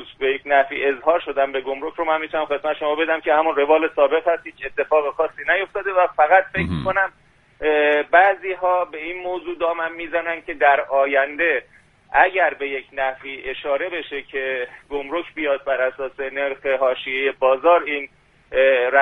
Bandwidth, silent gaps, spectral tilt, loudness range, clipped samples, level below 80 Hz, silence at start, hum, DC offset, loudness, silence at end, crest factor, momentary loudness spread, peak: 4.3 kHz; none; -6.5 dB/octave; 5 LU; under 0.1%; -52 dBFS; 0 s; none; under 0.1%; -20 LUFS; 0 s; 20 dB; 11 LU; 0 dBFS